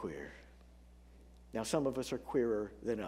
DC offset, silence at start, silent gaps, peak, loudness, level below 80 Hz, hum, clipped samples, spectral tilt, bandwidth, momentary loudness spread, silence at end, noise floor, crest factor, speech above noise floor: under 0.1%; 0 s; none; -18 dBFS; -37 LUFS; -60 dBFS; 60 Hz at -60 dBFS; under 0.1%; -5 dB/octave; 16 kHz; 14 LU; 0 s; -59 dBFS; 20 dB; 23 dB